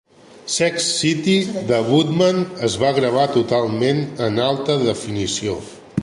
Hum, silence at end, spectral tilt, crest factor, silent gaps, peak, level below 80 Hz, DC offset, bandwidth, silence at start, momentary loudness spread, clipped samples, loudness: none; 0 s; -4.5 dB/octave; 16 dB; none; -4 dBFS; -50 dBFS; under 0.1%; 11.5 kHz; 0.35 s; 7 LU; under 0.1%; -19 LUFS